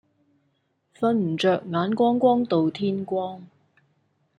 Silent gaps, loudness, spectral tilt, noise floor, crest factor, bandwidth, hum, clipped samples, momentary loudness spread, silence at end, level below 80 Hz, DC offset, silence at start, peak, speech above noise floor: none; -23 LUFS; -7.5 dB/octave; -71 dBFS; 18 dB; 10 kHz; none; under 0.1%; 9 LU; 0.95 s; -70 dBFS; under 0.1%; 1 s; -6 dBFS; 48 dB